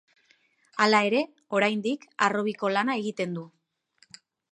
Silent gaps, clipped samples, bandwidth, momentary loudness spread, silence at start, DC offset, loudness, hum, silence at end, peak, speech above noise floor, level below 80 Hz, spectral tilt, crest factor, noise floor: none; under 0.1%; 10.5 kHz; 11 LU; 0.75 s; under 0.1%; -26 LUFS; none; 1.05 s; -6 dBFS; 40 dB; -80 dBFS; -4.5 dB/octave; 22 dB; -65 dBFS